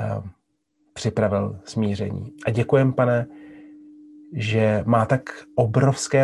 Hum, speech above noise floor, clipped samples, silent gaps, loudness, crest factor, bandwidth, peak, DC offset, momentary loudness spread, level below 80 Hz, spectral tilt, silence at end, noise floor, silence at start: none; 49 dB; under 0.1%; none; -22 LUFS; 18 dB; 11.5 kHz; -4 dBFS; under 0.1%; 11 LU; -50 dBFS; -6.5 dB/octave; 0 s; -70 dBFS; 0 s